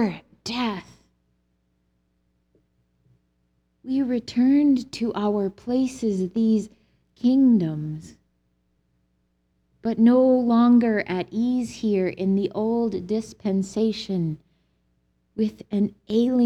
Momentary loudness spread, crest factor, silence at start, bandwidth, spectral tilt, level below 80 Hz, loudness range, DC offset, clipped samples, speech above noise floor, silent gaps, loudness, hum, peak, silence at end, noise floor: 12 LU; 16 dB; 0 s; 9.6 kHz; -7 dB/octave; -60 dBFS; 7 LU; under 0.1%; under 0.1%; 48 dB; none; -23 LUFS; none; -8 dBFS; 0 s; -69 dBFS